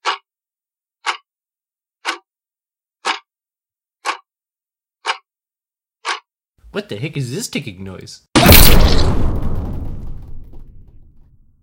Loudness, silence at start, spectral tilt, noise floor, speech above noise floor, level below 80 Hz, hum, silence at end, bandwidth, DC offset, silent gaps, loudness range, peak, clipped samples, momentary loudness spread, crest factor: -17 LUFS; 0.05 s; -4 dB/octave; under -90 dBFS; over 65 dB; -22 dBFS; none; 1 s; 17 kHz; under 0.1%; none; 14 LU; 0 dBFS; 0.2%; 22 LU; 18 dB